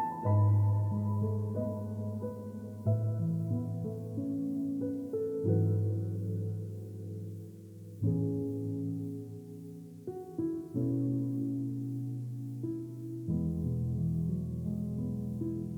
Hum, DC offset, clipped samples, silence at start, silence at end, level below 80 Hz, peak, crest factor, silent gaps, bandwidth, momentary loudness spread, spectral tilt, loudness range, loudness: none; under 0.1%; under 0.1%; 0 s; 0 s; -56 dBFS; -18 dBFS; 16 dB; none; 2.1 kHz; 13 LU; -11 dB/octave; 4 LU; -34 LUFS